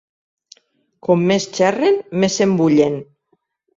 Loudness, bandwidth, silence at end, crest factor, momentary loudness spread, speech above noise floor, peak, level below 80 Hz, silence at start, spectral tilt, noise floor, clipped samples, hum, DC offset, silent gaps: -16 LUFS; 7.8 kHz; 0.75 s; 16 dB; 6 LU; 50 dB; -2 dBFS; -58 dBFS; 1.05 s; -5.5 dB/octave; -66 dBFS; under 0.1%; none; under 0.1%; none